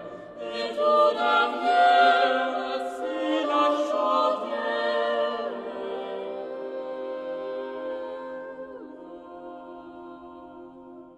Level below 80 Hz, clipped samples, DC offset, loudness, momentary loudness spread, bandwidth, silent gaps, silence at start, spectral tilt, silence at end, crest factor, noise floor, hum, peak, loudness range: -72 dBFS; under 0.1%; under 0.1%; -25 LUFS; 22 LU; 11 kHz; none; 0 s; -3.5 dB/octave; 0 s; 18 dB; -46 dBFS; none; -8 dBFS; 15 LU